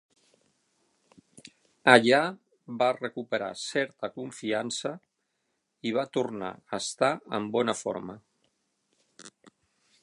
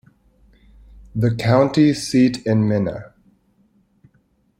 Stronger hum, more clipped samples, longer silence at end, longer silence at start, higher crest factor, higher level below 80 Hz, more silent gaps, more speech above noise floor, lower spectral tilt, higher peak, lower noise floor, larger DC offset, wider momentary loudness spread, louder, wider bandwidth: neither; neither; second, 0.75 s vs 1.55 s; first, 1.85 s vs 1.15 s; first, 28 dB vs 18 dB; second, -76 dBFS vs -50 dBFS; neither; first, 51 dB vs 45 dB; second, -3.5 dB/octave vs -7 dB/octave; about the same, -2 dBFS vs -2 dBFS; first, -79 dBFS vs -61 dBFS; neither; first, 18 LU vs 10 LU; second, -28 LUFS vs -18 LUFS; second, 11.5 kHz vs 13 kHz